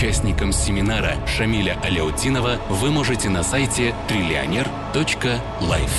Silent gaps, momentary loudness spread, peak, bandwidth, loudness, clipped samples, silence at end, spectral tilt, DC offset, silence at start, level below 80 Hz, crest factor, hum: none; 3 LU; -8 dBFS; 12.5 kHz; -21 LUFS; under 0.1%; 0 s; -4.5 dB/octave; under 0.1%; 0 s; -28 dBFS; 12 dB; none